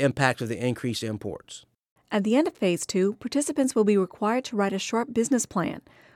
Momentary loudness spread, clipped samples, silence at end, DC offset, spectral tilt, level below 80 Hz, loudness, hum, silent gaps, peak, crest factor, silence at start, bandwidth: 11 LU; under 0.1%; 0.35 s; under 0.1%; -5 dB/octave; -64 dBFS; -26 LUFS; none; 1.91-1.96 s; -4 dBFS; 22 dB; 0 s; 16 kHz